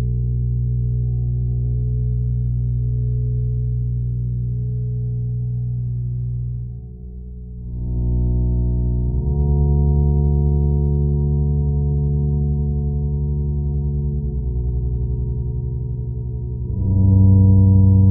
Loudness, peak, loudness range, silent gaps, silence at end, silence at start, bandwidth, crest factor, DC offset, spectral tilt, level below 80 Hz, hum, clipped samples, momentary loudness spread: -20 LUFS; -4 dBFS; 6 LU; none; 0 s; 0 s; 1 kHz; 14 dB; under 0.1%; -18 dB/octave; -24 dBFS; 60 Hz at -30 dBFS; under 0.1%; 11 LU